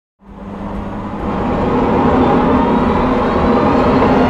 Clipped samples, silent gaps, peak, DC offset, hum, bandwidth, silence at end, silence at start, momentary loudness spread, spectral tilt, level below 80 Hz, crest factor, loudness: under 0.1%; none; -2 dBFS; under 0.1%; none; 7.8 kHz; 0 s; 0.25 s; 13 LU; -8.5 dB/octave; -28 dBFS; 12 dB; -14 LUFS